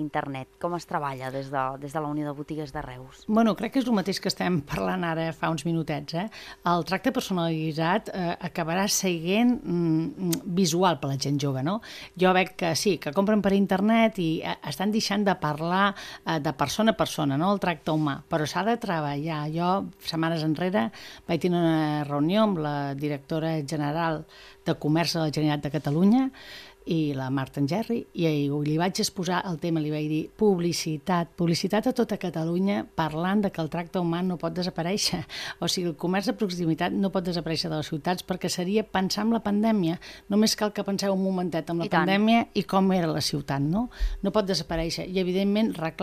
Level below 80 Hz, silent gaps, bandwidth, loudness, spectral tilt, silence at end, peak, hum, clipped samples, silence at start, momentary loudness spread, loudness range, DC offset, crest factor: -48 dBFS; none; 15 kHz; -26 LUFS; -5.5 dB/octave; 0 s; -8 dBFS; none; under 0.1%; 0 s; 8 LU; 3 LU; under 0.1%; 18 dB